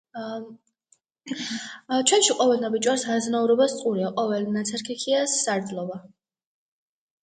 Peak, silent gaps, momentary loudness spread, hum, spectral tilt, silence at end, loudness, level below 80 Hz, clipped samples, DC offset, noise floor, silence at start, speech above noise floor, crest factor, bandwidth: -6 dBFS; none; 15 LU; none; -3 dB/octave; 1.15 s; -24 LUFS; -74 dBFS; under 0.1%; under 0.1%; -66 dBFS; 0.15 s; 42 dB; 20 dB; 9.6 kHz